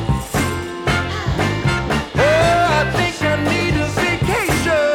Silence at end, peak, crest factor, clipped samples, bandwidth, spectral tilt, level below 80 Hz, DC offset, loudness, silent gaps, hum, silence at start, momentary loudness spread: 0 s; -8 dBFS; 10 dB; under 0.1%; 17.5 kHz; -5 dB/octave; -30 dBFS; under 0.1%; -17 LUFS; none; none; 0 s; 6 LU